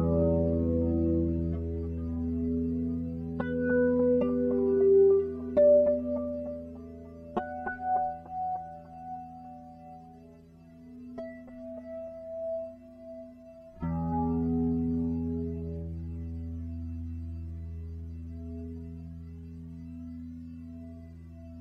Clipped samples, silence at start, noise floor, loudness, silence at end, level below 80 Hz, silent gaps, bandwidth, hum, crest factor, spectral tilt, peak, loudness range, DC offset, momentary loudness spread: under 0.1%; 0 s; -53 dBFS; -30 LUFS; 0 s; -44 dBFS; none; 3.8 kHz; 50 Hz at -65 dBFS; 16 dB; -11.5 dB/octave; -14 dBFS; 17 LU; under 0.1%; 21 LU